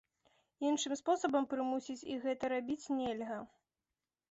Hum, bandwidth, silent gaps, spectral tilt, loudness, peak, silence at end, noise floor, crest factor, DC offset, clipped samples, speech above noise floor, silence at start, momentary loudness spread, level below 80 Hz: none; 8 kHz; none; -2.5 dB/octave; -37 LUFS; -20 dBFS; 0.85 s; under -90 dBFS; 18 dB; under 0.1%; under 0.1%; over 54 dB; 0.6 s; 9 LU; -76 dBFS